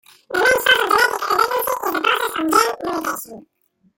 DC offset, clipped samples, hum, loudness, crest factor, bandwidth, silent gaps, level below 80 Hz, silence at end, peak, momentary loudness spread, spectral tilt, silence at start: under 0.1%; under 0.1%; none; -17 LUFS; 18 dB; 17 kHz; none; -56 dBFS; 0.55 s; -2 dBFS; 11 LU; -1.5 dB/octave; 0.3 s